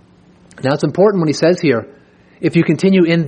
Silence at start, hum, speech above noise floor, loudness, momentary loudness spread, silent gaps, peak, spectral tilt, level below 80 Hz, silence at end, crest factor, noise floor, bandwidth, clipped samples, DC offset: 0.6 s; none; 34 dB; -14 LUFS; 8 LU; none; 0 dBFS; -7 dB/octave; -56 dBFS; 0 s; 14 dB; -47 dBFS; 9.6 kHz; under 0.1%; under 0.1%